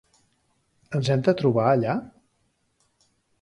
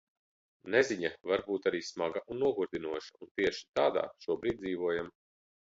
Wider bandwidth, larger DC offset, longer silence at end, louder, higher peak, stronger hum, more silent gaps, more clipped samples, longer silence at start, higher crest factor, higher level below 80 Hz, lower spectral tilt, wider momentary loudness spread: first, 11 kHz vs 7.8 kHz; neither; first, 1.35 s vs 0.65 s; first, -23 LUFS vs -33 LUFS; first, -6 dBFS vs -14 dBFS; neither; second, none vs 3.31-3.35 s; neither; first, 0.9 s vs 0.65 s; about the same, 20 dB vs 20 dB; about the same, -64 dBFS vs -66 dBFS; first, -7.5 dB/octave vs -4.5 dB/octave; about the same, 9 LU vs 9 LU